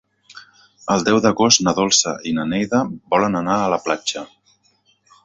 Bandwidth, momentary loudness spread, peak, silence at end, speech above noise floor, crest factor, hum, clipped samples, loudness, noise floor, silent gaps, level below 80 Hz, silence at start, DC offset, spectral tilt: 8.2 kHz; 9 LU; 0 dBFS; 1 s; 43 dB; 20 dB; none; under 0.1%; -18 LUFS; -61 dBFS; none; -54 dBFS; 0.35 s; under 0.1%; -3 dB/octave